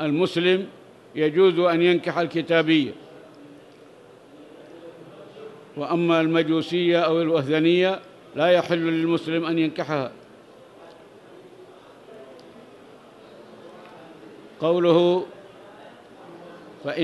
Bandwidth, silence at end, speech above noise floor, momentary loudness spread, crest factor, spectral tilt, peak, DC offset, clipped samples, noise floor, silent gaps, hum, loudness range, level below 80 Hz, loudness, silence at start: 10.5 kHz; 0 s; 28 dB; 25 LU; 18 dB; -7 dB/octave; -6 dBFS; under 0.1%; under 0.1%; -48 dBFS; none; none; 10 LU; -74 dBFS; -22 LUFS; 0 s